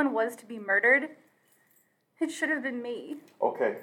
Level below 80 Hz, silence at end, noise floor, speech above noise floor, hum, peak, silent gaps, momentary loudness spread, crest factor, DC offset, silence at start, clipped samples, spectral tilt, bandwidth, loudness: under -90 dBFS; 0 s; -68 dBFS; 39 dB; none; -12 dBFS; none; 17 LU; 18 dB; under 0.1%; 0 s; under 0.1%; -4 dB/octave; 17.5 kHz; -28 LUFS